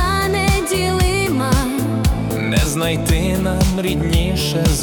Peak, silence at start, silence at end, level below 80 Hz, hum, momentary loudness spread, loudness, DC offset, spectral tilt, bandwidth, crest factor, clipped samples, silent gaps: -4 dBFS; 0 s; 0 s; -24 dBFS; none; 2 LU; -17 LUFS; under 0.1%; -5 dB/octave; 19 kHz; 12 dB; under 0.1%; none